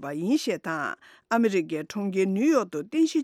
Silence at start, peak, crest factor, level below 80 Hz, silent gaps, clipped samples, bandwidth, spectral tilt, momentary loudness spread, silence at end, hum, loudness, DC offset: 0 s; -10 dBFS; 14 dB; -74 dBFS; none; under 0.1%; 14.5 kHz; -5.5 dB/octave; 8 LU; 0 s; none; -26 LUFS; under 0.1%